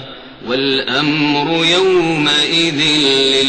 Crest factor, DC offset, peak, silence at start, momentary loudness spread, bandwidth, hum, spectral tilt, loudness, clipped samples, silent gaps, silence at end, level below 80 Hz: 12 dB; under 0.1%; -2 dBFS; 0 s; 7 LU; 9.2 kHz; none; -3.5 dB/octave; -13 LUFS; under 0.1%; none; 0 s; -48 dBFS